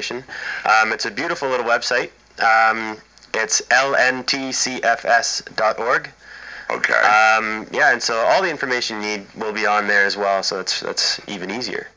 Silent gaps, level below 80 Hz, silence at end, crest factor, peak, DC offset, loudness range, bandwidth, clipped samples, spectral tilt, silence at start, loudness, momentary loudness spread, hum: none; -60 dBFS; 0.1 s; 18 dB; -2 dBFS; under 0.1%; 2 LU; 8 kHz; under 0.1%; -1 dB/octave; 0 s; -18 LUFS; 12 LU; none